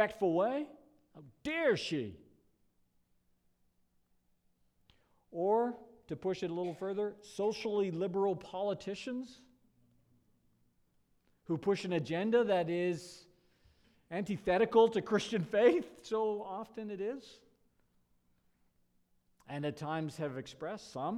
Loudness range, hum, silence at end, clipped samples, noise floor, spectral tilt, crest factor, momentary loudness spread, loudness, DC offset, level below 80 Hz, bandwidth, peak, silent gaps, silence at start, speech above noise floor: 12 LU; none; 0 s; under 0.1%; -74 dBFS; -6 dB/octave; 22 dB; 14 LU; -35 LUFS; under 0.1%; -72 dBFS; 12 kHz; -14 dBFS; none; 0 s; 39 dB